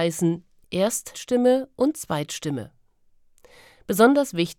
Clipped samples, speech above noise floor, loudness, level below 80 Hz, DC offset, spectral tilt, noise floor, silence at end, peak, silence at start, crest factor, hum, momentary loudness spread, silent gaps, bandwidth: under 0.1%; 36 dB; -23 LUFS; -62 dBFS; under 0.1%; -5 dB/octave; -59 dBFS; 0.05 s; -4 dBFS; 0 s; 20 dB; none; 15 LU; none; 18 kHz